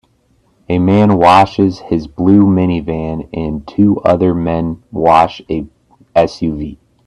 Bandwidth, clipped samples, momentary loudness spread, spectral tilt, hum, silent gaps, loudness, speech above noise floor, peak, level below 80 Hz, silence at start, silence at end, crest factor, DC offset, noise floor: 10.5 kHz; under 0.1%; 13 LU; -8 dB/octave; none; none; -13 LUFS; 43 dB; 0 dBFS; -38 dBFS; 0.7 s; 0.3 s; 12 dB; under 0.1%; -55 dBFS